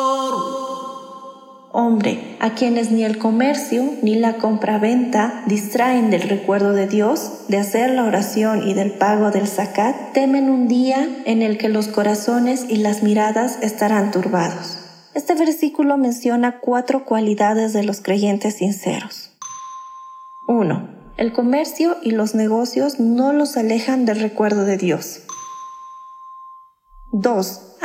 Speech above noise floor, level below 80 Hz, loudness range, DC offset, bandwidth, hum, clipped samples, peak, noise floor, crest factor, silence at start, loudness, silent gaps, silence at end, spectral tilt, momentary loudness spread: 27 dB; -60 dBFS; 4 LU; under 0.1%; 16.5 kHz; none; under 0.1%; -2 dBFS; -45 dBFS; 16 dB; 0 s; -18 LUFS; none; 0 s; -5.5 dB/octave; 15 LU